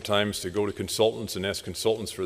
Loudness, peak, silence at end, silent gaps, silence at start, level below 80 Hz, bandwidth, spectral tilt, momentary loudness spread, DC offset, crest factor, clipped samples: -27 LUFS; -8 dBFS; 0 s; none; 0 s; -56 dBFS; 15.5 kHz; -4 dB/octave; 5 LU; under 0.1%; 20 dB; under 0.1%